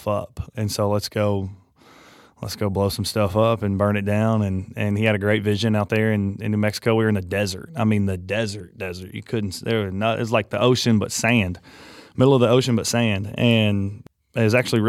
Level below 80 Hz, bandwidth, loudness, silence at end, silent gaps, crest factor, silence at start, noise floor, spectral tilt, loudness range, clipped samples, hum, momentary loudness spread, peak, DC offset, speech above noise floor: -52 dBFS; 15.5 kHz; -21 LUFS; 0 s; none; 18 dB; 0 s; -51 dBFS; -5.5 dB/octave; 4 LU; under 0.1%; none; 11 LU; -4 dBFS; under 0.1%; 30 dB